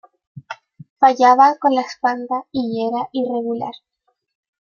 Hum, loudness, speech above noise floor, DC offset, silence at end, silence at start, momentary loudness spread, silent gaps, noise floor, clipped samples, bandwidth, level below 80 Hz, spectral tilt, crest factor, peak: none; -17 LUFS; 20 dB; under 0.1%; 0.9 s; 0.35 s; 22 LU; 0.90-0.96 s; -37 dBFS; under 0.1%; 7.2 kHz; -68 dBFS; -5 dB/octave; 18 dB; -2 dBFS